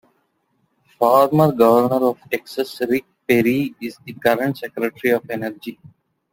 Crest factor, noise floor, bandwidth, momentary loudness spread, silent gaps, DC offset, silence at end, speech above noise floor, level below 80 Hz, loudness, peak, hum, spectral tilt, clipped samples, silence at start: 18 dB; -67 dBFS; 17 kHz; 13 LU; none; under 0.1%; 0.6 s; 49 dB; -60 dBFS; -19 LUFS; -2 dBFS; none; -6.5 dB/octave; under 0.1%; 1 s